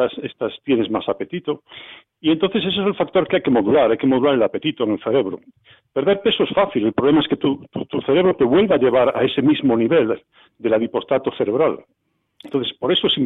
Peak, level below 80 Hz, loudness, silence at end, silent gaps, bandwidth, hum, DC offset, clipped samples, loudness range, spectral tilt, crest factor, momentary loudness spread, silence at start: -6 dBFS; -56 dBFS; -19 LUFS; 0 s; none; 4.1 kHz; none; under 0.1%; under 0.1%; 4 LU; -8.5 dB/octave; 12 dB; 11 LU; 0 s